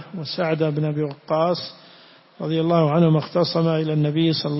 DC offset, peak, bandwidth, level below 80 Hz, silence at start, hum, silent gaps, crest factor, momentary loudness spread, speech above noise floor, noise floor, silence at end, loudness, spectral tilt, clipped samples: under 0.1%; -6 dBFS; 5.8 kHz; -62 dBFS; 0 s; none; none; 16 dB; 9 LU; 29 dB; -49 dBFS; 0 s; -21 LUFS; -10 dB/octave; under 0.1%